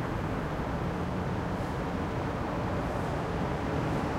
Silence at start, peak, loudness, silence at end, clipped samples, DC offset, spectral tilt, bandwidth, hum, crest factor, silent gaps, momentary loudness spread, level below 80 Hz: 0 s; -18 dBFS; -32 LUFS; 0 s; under 0.1%; under 0.1%; -7 dB/octave; 16.5 kHz; none; 12 dB; none; 2 LU; -42 dBFS